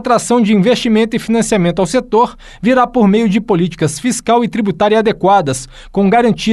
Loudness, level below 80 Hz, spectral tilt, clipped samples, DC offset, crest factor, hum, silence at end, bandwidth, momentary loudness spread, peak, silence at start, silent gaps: -13 LUFS; -40 dBFS; -5.5 dB/octave; under 0.1%; under 0.1%; 12 dB; none; 0 s; 12.5 kHz; 6 LU; -2 dBFS; 0 s; none